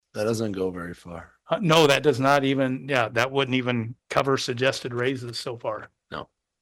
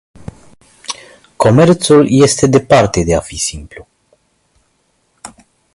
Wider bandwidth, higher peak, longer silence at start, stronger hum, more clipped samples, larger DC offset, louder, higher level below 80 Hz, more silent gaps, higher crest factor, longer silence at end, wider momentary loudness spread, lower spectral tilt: first, 16.5 kHz vs 11.5 kHz; second, -6 dBFS vs 0 dBFS; second, 0.15 s vs 0.9 s; neither; neither; neither; second, -24 LUFS vs -11 LUFS; second, -60 dBFS vs -36 dBFS; neither; about the same, 18 dB vs 14 dB; about the same, 0.4 s vs 0.45 s; about the same, 19 LU vs 18 LU; about the same, -5 dB/octave vs -5.5 dB/octave